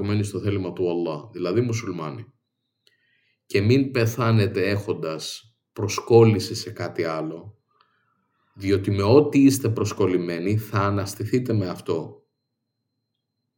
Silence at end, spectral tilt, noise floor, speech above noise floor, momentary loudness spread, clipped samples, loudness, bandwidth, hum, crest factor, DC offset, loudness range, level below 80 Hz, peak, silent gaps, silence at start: 1.45 s; -6.5 dB/octave; -79 dBFS; 57 dB; 14 LU; under 0.1%; -23 LUFS; 17.5 kHz; none; 20 dB; under 0.1%; 6 LU; -68 dBFS; -2 dBFS; none; 0 s